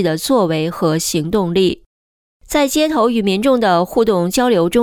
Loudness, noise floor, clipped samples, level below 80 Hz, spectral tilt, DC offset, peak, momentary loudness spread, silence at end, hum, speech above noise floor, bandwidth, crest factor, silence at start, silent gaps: -15 LUFS; under -90 dBFS; under 0.1%; -44 dBFS; -5 dB/octave; under 0.1%; -2 dBFS; 4 LU; 0 s; none; over 75 dB; 19.5 kHz; 12 dB; 0 s; 1.86-2.40 s